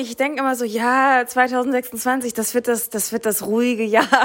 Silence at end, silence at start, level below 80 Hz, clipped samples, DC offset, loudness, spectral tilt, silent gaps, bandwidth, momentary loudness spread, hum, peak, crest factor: 0 s; 0 s; -64 dBFS; under 0.1%; under 0.1%; -19 LUFS; -2.5 dB/octave; none; 16.5 kHz; 6 LU; none; -2 dBFS; 18 dB